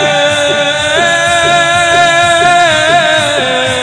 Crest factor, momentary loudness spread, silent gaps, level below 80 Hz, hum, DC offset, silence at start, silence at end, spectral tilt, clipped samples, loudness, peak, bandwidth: 10 dB; 3 LU; none; -42 dBFS; none; under 0.1%; 0 s; 0 s; -2 dB/octave; 0.3%; -8 LUFS; 0 dBFS; 10 kHz